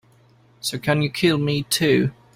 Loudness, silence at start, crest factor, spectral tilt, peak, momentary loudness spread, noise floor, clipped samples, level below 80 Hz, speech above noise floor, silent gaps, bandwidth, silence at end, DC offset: -21 LUFS; 0.65 s; 16 dB; -5 dB/octave; -6 dBFS; 8 LU; -55 dBFS; under 0.1%; -54 dBFS; 35 dB; none; 16 kHz; 0.25 s; under 0.1%